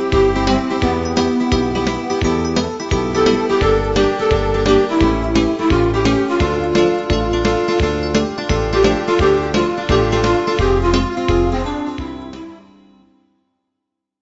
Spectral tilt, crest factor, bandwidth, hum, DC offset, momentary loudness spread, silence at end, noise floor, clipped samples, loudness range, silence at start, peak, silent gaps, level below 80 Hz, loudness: -6 dB/octave; 16 dB; 8 kHz; none; 0.2%; 5 LU; 1.65 s; -78 dBFS; under 0.1%; 3 LU; 0 s; 0 dBFS; none; -26 dBFS; -16 LUFS